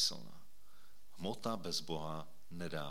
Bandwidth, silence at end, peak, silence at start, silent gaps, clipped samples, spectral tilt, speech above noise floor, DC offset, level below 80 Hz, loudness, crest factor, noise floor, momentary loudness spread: 18 kHz; 0 s; -22 dBFS; 0 s; none; under 0.1%; -3.5 dB/octave; 26 dB; 0.7%; -70 dBFS; -42 LUFS; 20 dB; -68 dBFS; 14 LU